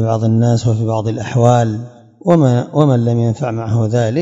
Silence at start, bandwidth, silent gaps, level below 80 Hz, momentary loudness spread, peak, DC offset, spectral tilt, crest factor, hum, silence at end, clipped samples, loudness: 0 s; 7.8 kHz; none; -50 dBFS; 8 LU; 0 dBFS; under 0.1%; -8 dB/octave; 14 dB; none; 0 s; 0.2%; -14 LUFS